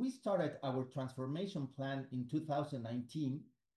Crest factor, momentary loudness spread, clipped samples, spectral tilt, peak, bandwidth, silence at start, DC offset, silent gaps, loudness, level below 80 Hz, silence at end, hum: 16 dB; 6 LU; under 0.1%; -7.5 dB/octave; -26 dBFS; 12 kHz; 0 s; under 0.1%; none; -41 LUFS; -80 dBFS; 0.3 s; none